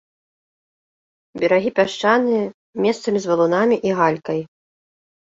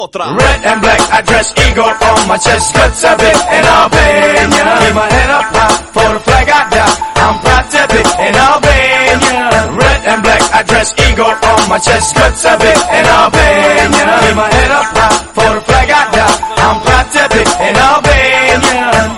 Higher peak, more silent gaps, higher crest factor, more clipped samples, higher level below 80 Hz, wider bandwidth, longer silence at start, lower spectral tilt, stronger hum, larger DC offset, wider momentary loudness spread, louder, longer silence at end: about the same, -2 dBFS vs 0 dBFS; first, 2.54-2.73 s vs none; first, 18 dB vs 8 dB; second, under 0.1% vs 1%; second, -64 dBFS vs -20 dBFS; second, 7.8 kHz vs 15.5 kHz; first, 1.35 s vs 0 s; first, -5.5 dB/octave vs -3.5 dB/octave; neither; neither; first, 9 LU vs 3 LU; second, -19 LUFS vs -7 LUFS; first, 0.75 s vs 0 s